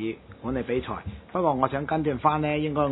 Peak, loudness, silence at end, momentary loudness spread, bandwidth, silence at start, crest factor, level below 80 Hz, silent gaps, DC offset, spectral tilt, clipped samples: -6 dBFS; -27 LUFS; 0 s; 11 LU; 4.1 kHz; 0 s; 20 dB; -48 dBFS; none; under 0.1%; -11 dB/octave; under 0.1%